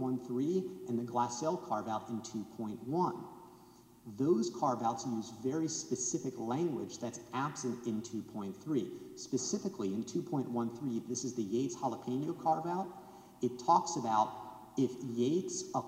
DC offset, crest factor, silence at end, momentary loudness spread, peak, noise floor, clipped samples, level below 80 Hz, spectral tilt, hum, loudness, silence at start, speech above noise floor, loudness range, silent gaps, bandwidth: under 0.1%; 22 dB; 0 s; 10 LU; -14 dBFS; -59 dBFS; under 0.1%; -76 dBFS; -5.5 dB/octave; none; -36 LUFS; 0 s; 24 dB; 4 LU; none; 16 kHz